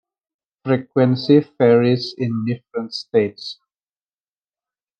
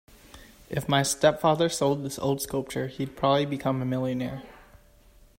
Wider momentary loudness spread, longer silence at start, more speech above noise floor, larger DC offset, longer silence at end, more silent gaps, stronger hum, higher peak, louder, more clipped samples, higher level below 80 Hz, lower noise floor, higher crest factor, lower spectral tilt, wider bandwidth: about the same, 13 LU vs 11 LU; first, 0.65 s vs 0.35 s; first, over 72 dB vs 30 dB; neither; first, 1.45 s vs 0.85 s; neither; neither; first, -2 dBFS vs -8 dBFS; first, -18 LUFS vs -26 LUFS; neither; second, -70 dBFS vs -54 dBFS; first, under -90 dBFS vs -56 dBFS; about the same, 18 dB vs 20 dB; first, -8 dB/octave vs -5 dB/octave; second, 8.8 kHz vs 16 kHz